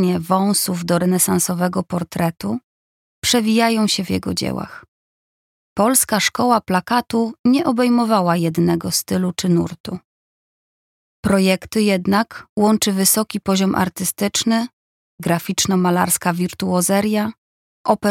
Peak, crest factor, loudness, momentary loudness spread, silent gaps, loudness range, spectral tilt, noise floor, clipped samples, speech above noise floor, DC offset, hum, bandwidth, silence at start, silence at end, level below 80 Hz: -2 dBFS; 18 dB; -18 LUFS; 10 LU; 2.64-3.22 s, 4.88-5.76 s, 7.39-7.44 s, 9.80-9.84 s, 10.04-11.23 s, 12.49-12.57 s, 14.73-15.18 s, 17.38-17.85 s; 3 LU; -4.5 dB/octave; under -90 dBFS; under 0.1%; over 72 dB; under 0.1%; none; 17 kHz; 0 s; 0 s; -52 dBFS